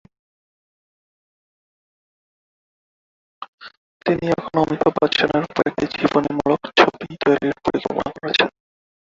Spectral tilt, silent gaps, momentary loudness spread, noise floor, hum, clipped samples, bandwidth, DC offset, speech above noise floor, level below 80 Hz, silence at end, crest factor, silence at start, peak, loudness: -5.5 dB/octave; 3.48-3.58 s, 3.77-4.00 s; 9 LU; under -90 dBFS; none; under 0.1%; 7.8 kHz; under 0.1%; over 71 dB; -54 dBFS; 0.65 s; 22 dB; 3.4 s; 0 dBFS; -20 LUFS